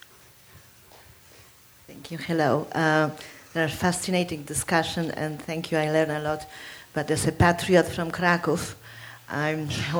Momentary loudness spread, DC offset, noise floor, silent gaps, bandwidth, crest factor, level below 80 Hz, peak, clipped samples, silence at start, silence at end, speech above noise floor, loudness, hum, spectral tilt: 15 LU; under 0.1%; -53 dBFS; none; over 20 kHz; 22 dB; -50 dBFS; -6 dBFS; under 0.1%; 0.55 s; 0 s; 28 dB; -25 LUFS; none; -5 dB/octave